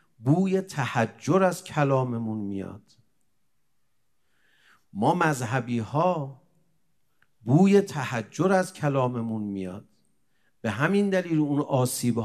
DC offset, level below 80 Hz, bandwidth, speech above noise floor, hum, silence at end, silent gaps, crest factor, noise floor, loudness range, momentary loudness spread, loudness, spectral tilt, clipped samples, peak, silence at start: under 0.1%; -72 dBFS; 13.5 kHz; 53 dB; none; 0 s; none; 20 dB; -77 dBFS; 6 LU; 11 LU; -25 LUFS; -6.5 dB/octave; under 0.1%; -6 dBFS; 0.2 s